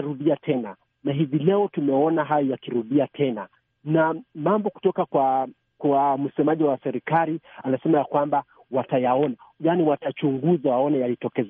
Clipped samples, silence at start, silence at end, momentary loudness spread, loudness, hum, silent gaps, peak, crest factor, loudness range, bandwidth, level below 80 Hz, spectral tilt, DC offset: under 0.1%; 0 s; 0 s; 7 LU; -23 LUFS; none; none; -8 dBFS; 16 dB; 1 LU; 3.7 kHz; -72 dBFS; -6.5 dB/octave; under 0.1%